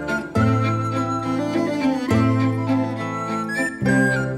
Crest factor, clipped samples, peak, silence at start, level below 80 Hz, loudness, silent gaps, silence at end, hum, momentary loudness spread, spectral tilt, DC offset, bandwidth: 16 dB; under 0.1%; -6 dBFS; 0 s; -48 dBFS; -21 LUFS; none; 0 s; none; 6 LU; -7 dB/octave; under 0.1%; 13 kHz